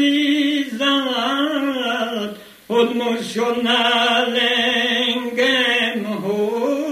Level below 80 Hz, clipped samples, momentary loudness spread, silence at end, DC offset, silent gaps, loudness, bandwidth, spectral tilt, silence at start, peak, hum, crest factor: -68 dBFS; under 0.1%; 7 LU; 0 s; under 0.1%; none; -18 LUFS; 15 kHz; -3.5 dB/octave; 0 s; -4 dBFS; none; 16 dB